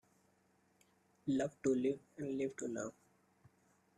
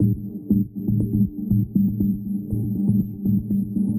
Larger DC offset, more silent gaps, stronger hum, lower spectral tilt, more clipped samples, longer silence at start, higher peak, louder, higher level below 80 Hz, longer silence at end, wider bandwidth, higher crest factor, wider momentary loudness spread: neither; neither; neither; second, -6 dB/octave vs -13.5 dB/octave; neither; first, 1.25 s vs 0 s; second, -24 dBFS vs -8 dBFS; second, -40 LUFS vs -23 LUFS; second, -78 dBFS vs -40 dBFS; first, 1.05 s vs 0 s; second, 11 kHz vs 15 kHz; about the same, 18 dB vs 14 dB; first, 10 LU vs 5 LU